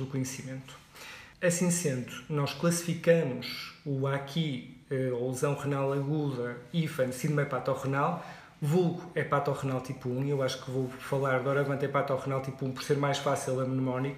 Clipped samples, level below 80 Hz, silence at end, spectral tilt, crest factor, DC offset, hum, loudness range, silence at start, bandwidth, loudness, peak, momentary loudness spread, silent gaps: under 0.1%; -66 dBFS; 0 s; -5.5 dB/octave; 18 dB; under 0.1%; none; 2 LU; 0 s; 15.5 kHz; -31 LUFS; -12 dBFS; 9 LU; none